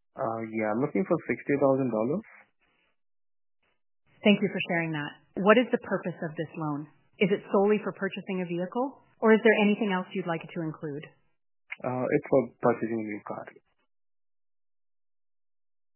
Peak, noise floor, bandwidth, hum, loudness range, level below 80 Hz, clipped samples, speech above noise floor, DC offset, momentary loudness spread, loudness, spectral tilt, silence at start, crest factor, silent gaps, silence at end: -4 dBFS; -71 dBFS; 3.2 kHz; none; 5 LU; -72 dBFS; under 0.1%; 44 dB; under 0.1%; 14 LU; -28 LUFS; -10 dB/octave; 0.15 s; 24 dB; none; 2.45 s